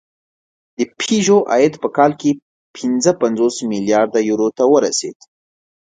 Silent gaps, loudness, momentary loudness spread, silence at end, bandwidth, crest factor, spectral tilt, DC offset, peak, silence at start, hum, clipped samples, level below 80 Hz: 2.42-2.74 s; -16 LUFS; 10 LU; 0.75 s; 9.4 kHz; 16 dB; -4.5 dB/octave; under 0.1%; 0 dBFS; 0.8 s; none; under 0.1%; -64 dBFS